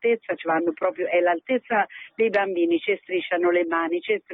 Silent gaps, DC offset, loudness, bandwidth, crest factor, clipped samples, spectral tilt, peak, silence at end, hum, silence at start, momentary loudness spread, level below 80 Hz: none; under 0.1%; -24 LUFS; 4.6 kHz; 14 dB; under 0.1%; -7 dB/octave; -10 dBFS; 0 s; none; 0 s; 4 LU; -76 dBFS